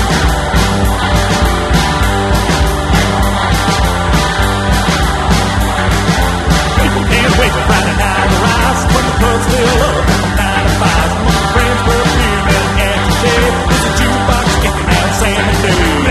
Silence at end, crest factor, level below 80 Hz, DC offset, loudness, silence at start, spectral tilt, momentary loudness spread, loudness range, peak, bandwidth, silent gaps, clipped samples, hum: 0 s; 10 dB; -16 dBFS; under 0.1%; -11 LUFS; 0 s; -4.5 dB/octave; 2 LU; 1 LU; 0 dBFS; 13.5 kHz; none; under 0.1%; none